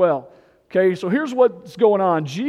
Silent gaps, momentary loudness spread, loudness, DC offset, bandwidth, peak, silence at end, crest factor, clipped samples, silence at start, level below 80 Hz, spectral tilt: none; 6 LU; -19 LUFS; under 0.1%; 12 kHz; -4 dBFS; 0 s; 16 dB; under 0.1%; 0 s; -68 dBFS; -7 dB/octave